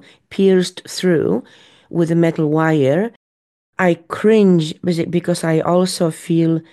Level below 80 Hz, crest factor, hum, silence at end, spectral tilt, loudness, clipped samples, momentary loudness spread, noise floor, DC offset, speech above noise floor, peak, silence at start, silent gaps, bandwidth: -60 dBFS; 14 dB; none; 0.1 s; -6.5 dB/octave; -17 LUFS; under 0.1%; 7 LU; under -90 dBFS; under 0.1%; over 74 dB; -2 dBFS; 0.3 s; 3.16-3.73 s; 12.5 kHz